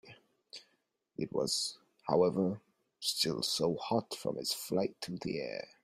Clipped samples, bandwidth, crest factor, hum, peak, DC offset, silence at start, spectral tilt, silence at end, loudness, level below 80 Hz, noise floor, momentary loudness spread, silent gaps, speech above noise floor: under 0.1%; 16 kHz; 22 dB; none; -14 dBFS; under 0.1%; 0.05 s; -4 dB/octave; 0.15 s; -34 LUFS; -72 dBFS; -78 dBFS; 16 LU; none; 44 dB